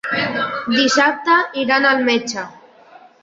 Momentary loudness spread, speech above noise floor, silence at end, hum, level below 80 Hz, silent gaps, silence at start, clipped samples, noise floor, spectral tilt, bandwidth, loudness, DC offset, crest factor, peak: 10 LU; 29 dB; 0.7 s; none; -62 dBFS; none; 0.05 s; under 0.1%; -45 dBFS; -2.5 dB/octave; 7.8 kHz; -16 LUFS; under 0.1%; 16 dB; -2 dBFS